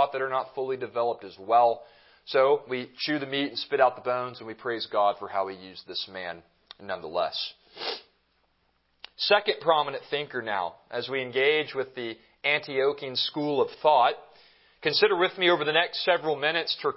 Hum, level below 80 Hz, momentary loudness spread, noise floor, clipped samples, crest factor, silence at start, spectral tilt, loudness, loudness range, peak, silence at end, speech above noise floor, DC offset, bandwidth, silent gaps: none; -72 dBFS; 14 LU; -70 dBFS; under 0.1%; 22 dB; 0 s; -7.5 dB/octave; -27 LUFS; 7 LU; -6 dBFS; 0 s; 44 dB; under 0.1%; 5.8 kHz; none